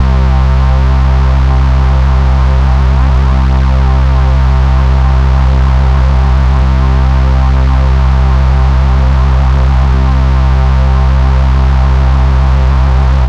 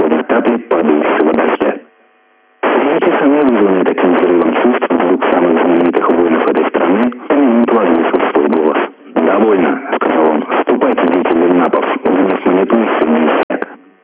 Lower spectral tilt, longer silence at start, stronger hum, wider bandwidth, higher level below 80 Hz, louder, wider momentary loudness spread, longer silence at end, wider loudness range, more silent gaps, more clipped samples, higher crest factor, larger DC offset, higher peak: second, -8 dB/octave vs -10 dB/octave; about the same, 0 s vs 0 s; neither; first, 6.2 kHz vs 4 kHz; first, -8 dBFS vs -54 dBFS; about the same, -10 LUFS vs -12 LUFS; second, 0 LU vs 4 LU; second, 0 s vs 0.3 s; about the same, 0 LU vs 2 LU; second, none vs 13.43-13.49 s; neither; about the same, 8 dB vs 12 dB; first, 2% vs under 0.1%; about the same, 0 dBFS vs 0 dBFS